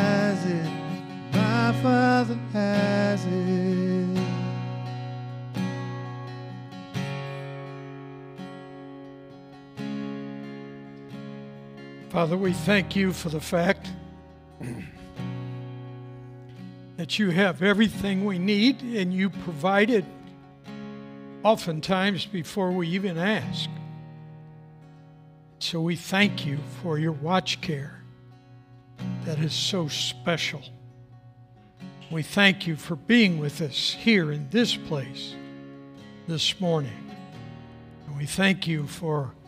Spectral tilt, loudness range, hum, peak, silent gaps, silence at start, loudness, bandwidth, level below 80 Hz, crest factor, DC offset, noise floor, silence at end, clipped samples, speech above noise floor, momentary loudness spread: -5.5 dB/octave; 13 LU; none; -2 dBFS; none; 0 s; -26 LUFS; 15.5 kHz; -60 dBFS; 24 dB; under 0.1%; -52 dBFS; 0 s; under 0.1%; 27 dB; 21 LU